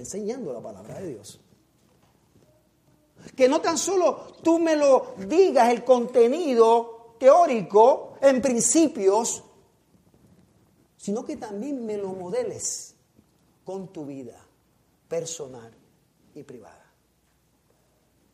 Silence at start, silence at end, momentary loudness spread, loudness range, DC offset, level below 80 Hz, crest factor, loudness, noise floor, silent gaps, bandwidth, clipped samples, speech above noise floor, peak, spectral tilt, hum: 0 s; 1.75 s; 20 LU; 19 LU; under 0.1%; -68 dBFS; 20 dB; -22 LUFS; -66 dBFS; none; 15 kHz; under 0.1%; 44 dB; -4 dBFS; -4 dB/octave; none